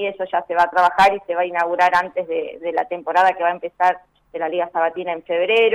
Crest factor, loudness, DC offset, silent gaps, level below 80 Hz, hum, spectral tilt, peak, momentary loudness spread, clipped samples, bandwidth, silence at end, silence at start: 12 dB; -19 LUFS; under 0.1%; none; -60 dBFS; none; -4 dB/octave; -6 dBFS; 9 LU; under 0.1%; 13.5 kHz; 0 s; 0 s